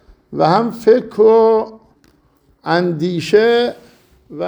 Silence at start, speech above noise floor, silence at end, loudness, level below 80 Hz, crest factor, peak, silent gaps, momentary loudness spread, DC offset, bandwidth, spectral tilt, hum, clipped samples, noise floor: 0.3 s; 42 dB; 0 s; -14 LUFS; -54 dBFS; 14 dB; 0 dBFS; none; 11 LU; under 0.1%; over 20 kHz; -6.5 dB/octave; none; under 0.1%; -55 dBFS